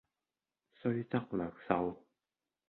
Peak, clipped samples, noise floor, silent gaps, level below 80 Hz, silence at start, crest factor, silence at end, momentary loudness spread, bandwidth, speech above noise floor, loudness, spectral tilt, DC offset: -12 dBFS; under 0.1%; under -90 dBFS; none; -68 dBFS; 0.85 s; 26 dB; 0.7 s; 6 LU; 4.3 kHz; over 54 dB; -37 LUFS; -7 dB/octave; under 0.1%